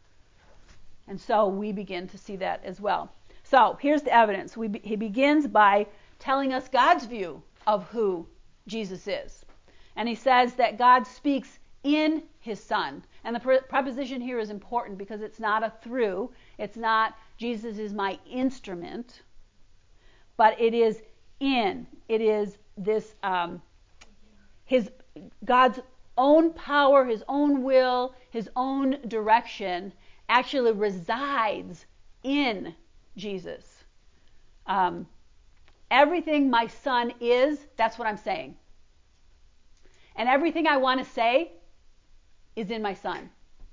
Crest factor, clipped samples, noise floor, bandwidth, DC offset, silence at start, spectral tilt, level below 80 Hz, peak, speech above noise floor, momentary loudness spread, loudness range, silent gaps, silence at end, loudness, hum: 20 dB; under 0.1%; -57 dBFS; 7.6 kHz; under 0.1%; 0.75 s; -5.5 dB/octave; -58 dBFS; -6 dBFS; 32 dB; 17 LU; 8 LU; none; 0.05 s; -25 LUFS; none